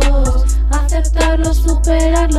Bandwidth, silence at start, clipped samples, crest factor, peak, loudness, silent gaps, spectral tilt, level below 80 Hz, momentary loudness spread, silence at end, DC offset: 12.5 kHz; 0 s; under 0.1%; 10 dB; 0 dBFS; -15 LUFS; none; -5.5 dB/octave; -12 dBFS; 2 LU; 0 s; under 0.1%